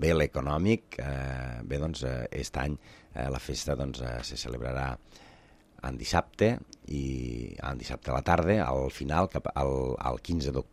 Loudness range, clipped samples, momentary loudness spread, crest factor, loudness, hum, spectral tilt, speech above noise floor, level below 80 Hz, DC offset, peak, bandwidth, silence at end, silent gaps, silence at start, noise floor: 5 LU; under 0.1%; 10 LU; 22 dB; -31 LUFS; none; -6 dB/octave; 27 dB; -42 dBFS; under 0.1%; -8 dBFS; 14.5 kHz; 0.05 s; none; 0 s; -57 dBFS